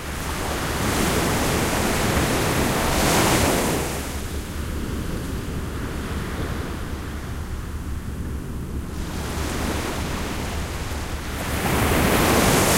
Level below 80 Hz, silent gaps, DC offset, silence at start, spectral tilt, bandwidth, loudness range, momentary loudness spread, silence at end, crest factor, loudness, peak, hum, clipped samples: -30 dBFS; none; under 0.1%; 0 s; -4 dB/octave; 16 kHz; 10 LU; 13 LU; 0 s; 18 dB; -24 LUFS; -6 dBFS; none; under 0.1%